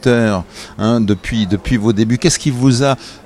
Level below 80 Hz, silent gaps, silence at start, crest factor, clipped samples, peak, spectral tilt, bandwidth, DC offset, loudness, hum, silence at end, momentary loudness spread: -34 dBFS; none; 0.05 s; 14 dB; under 0.1%; 0 dBFS; -5.5 dB/octave; 13 kHz; under 0.1%; -15 LUFS; none; 0.1 s; 5 LU